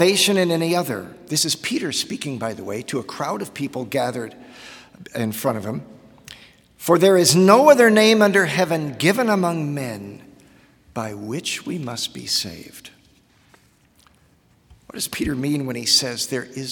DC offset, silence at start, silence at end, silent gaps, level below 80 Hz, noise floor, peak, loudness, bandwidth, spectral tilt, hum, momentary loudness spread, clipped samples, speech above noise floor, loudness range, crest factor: under 0.1%; 0 s; 0 s; none; -56 dBFS; -57 dBFS; 0 dBFS; -19 LUFS; 18 kHz; -4 dB/octave; none; 18 LU; under 0.1%; 37 dB; 13 LU; 20 dB